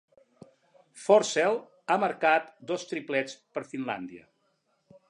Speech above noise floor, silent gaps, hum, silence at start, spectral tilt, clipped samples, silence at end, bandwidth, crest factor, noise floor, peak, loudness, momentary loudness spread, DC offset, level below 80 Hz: 46 dB; none; none; 0.95 s; -3.5 dB/octave; under 0.1%; 0.9 s; 11 kHz; 22 dB; -73 dBFS; -8 dBFS; -28 LUFS; 14 LU; under 0.1%; -82 dBFS